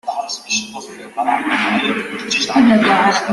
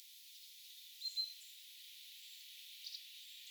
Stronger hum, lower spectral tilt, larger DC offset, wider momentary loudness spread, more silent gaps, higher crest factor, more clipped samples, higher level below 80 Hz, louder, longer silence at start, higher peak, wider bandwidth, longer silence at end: neither; first, -3 dB/octave vs 8.5 dB/octave; neither; about the same, 13 LU vs 13 LU; neither; second, 14 dB vs 20 dB; neither; first, -56 dBFS vs under -90 dBFS; first, -16 LUFS vs -48 LUFS; about the same, 0.05 s vs 0 s; first, -2 dBFS vs -30 dBFS; second, 12 kHz vs over 20 kHz; about the same, 0 s vs 0 s